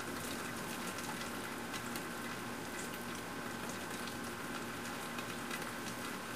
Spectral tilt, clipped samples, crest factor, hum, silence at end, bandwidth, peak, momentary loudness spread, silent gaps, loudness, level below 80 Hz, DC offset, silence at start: -3 dB/octave; under 0.1%; 16 dB; none; 0 s; 16 kHz; -26 dBFS; 2 LU; none; -42 LUFS; -66 dBFS; 0.1%; 0 s